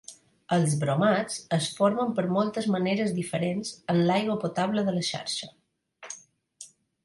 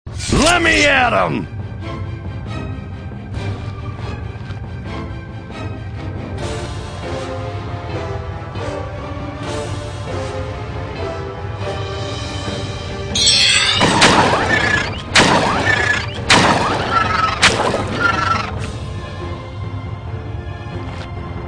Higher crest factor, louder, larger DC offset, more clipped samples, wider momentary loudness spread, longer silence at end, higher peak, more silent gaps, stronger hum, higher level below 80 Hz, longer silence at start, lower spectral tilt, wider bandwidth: about the same, 18 dB vs 18 dB; second, -27 LUFS vs -17 LUFS; neither; neither; about the same, 18 LU vs 17 LU; first, 0.4 s vs 0 s; second, -10 dBFS vs 0 dBFS; neither; neither; second, -68 dBFS vs -34 dBFS; about the same, 0.1 s vs 0.05 s; first, -5.5 dB/octave vs -3.5 dB/octave; about the same, 11.5 kHz vs 10.5 kHz